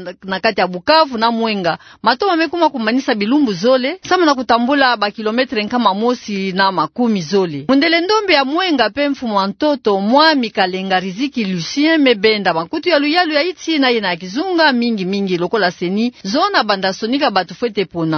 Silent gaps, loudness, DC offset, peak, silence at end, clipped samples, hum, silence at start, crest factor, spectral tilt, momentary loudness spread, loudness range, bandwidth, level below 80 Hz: none; -15 LUFS; under 0.1%; 0 dBFS; 0 s; under 0.1%; none; 0 s; 16 dB; -5 dB/octave; 6 LU; 2 LU; 6.6 kHz; -56 dBFS